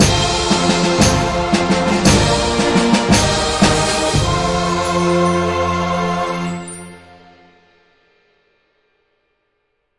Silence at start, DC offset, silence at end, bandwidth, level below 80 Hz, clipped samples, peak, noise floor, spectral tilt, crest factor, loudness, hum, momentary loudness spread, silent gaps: 0 s; under 0.1%; 3 s; 11.5 kHz; -32 dBFS; under 0.1%; 0 dBFS; -68 dBFS; -4 dB/octave; 16 dB; -15 LUFS; none; 7 LU; none